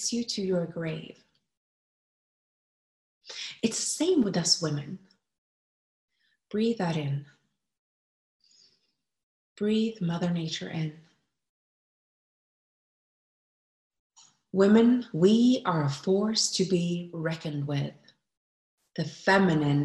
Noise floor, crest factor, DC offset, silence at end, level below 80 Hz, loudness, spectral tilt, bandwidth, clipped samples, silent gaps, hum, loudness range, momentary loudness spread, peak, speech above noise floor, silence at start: -77 dBFS; 20 dB; under 0.1%; 0 s; -70 dBFS; -27 LUFS; -5 dB/octave; 12.5 kHz; under 0.1%; 1.57-3.21 s, 5.38-6.08 s, 7.79-8.40 s, 9.23-9.56 s, 11.49-13.90 s, 13.99-14.10 s, 18.37-18.78 s; none; 12 LU; 14 LU; -10 dBFS; 51 dB; 0 s